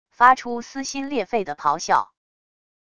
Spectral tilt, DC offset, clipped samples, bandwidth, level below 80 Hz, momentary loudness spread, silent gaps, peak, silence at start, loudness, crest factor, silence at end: -3 dB/octave; under 0.1%; under 0.1%; 11 kHz; -60 dBFS; 13 LU; none; -2 dBFS; 0.2 s; -22 LUFS; 22 dB; 0.8 s